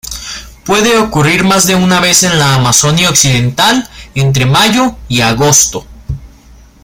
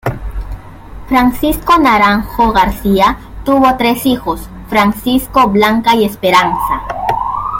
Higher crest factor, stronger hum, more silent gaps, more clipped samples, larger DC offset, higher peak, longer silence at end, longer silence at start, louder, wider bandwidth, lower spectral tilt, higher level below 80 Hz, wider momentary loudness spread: about the same, 10 dB vs 12 dB; neither; neither; first, 0.2% vs under 0.1%; neither; about the same, 0 dBFS vs 0 dBFS; first, 0.55 s vs 0 s; about the same, 0.05 s vs 0.05 s; first, -8 LUFS vs -12 LUFS; first, over 20 kHz vs 17 kHz; second, -3 dB/octave vs -5 dB/octave; about the same, -32 dBFS vs -28 dBFS; first, 16 LU vs 11 LU